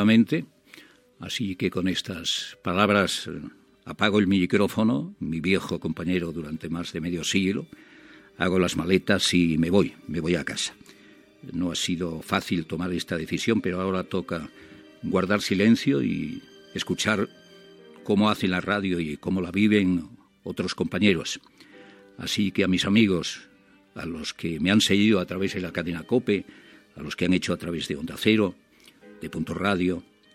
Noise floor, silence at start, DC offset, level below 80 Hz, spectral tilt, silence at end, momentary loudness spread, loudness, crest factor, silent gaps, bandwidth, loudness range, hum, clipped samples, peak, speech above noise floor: -53 dBFS; 0 s; under 0.1%; -58 dBFS; -5 dB/octave; 0.35 s; 15 LU; -25 LUFS; 22 dB; none; 15.5 kHz; 4 LU; none; under 0.1%; -2 dBFS; 28 dB